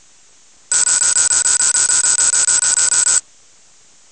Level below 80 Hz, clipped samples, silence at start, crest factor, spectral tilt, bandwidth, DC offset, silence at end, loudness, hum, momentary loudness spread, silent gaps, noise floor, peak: -54 dBFS; under 0.1%; 0.7 s; 14 dB; 3 dB/octave; 8 kHz; 0.1%; 0.9 s; -8 LUFS; none; 3 LU; none; -48 dBFS; 0 dBFS